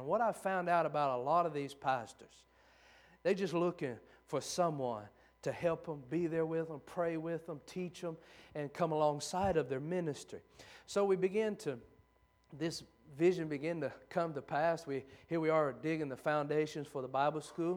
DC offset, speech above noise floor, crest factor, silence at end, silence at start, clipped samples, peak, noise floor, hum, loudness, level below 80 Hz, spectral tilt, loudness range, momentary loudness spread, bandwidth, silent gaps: under 0.1%; 34 dB; 18 dB; 0 s; 0 s; under 0.1%; -18 dBFS; -71 dBFS; none; -37 LUFS; -70 dBFS; -6 dB/octave; 3 LU; 12 LU; 19 kHz; none